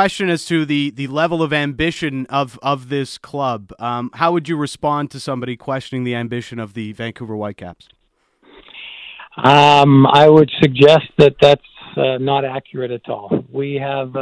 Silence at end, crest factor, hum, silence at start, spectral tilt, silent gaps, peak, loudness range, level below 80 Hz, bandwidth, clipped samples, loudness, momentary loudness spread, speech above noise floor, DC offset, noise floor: 0 s; 16 dB; none; 0 s; -6.5 dB/octave; none; 0 dBFS; 14 LU; -50 dBFS; 11 kHz; 0.1%; -16 LUFS; 18 LU; 43 dB; under 0.1%; -59 dBFS